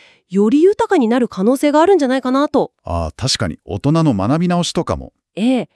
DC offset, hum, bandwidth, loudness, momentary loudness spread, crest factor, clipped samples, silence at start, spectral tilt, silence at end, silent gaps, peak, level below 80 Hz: under 0.1%; none; 12 kHz; -16 LUFS; 10 LU; 14 dB; under 0.1%; 0.3 s; -6 dB/octave; 0.1 s; none; -2 dBFS; -42 dBFS